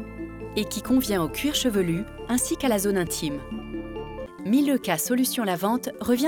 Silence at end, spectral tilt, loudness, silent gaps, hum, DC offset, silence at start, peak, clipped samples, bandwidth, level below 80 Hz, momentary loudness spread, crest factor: 0 s; -4 dB/octave; -25 LUFS; none; none; under 0.1%; 0 s; -10 dBFS; under 0.1%; over 20 kHz; -46 dBFS; 12 LU; 16 dB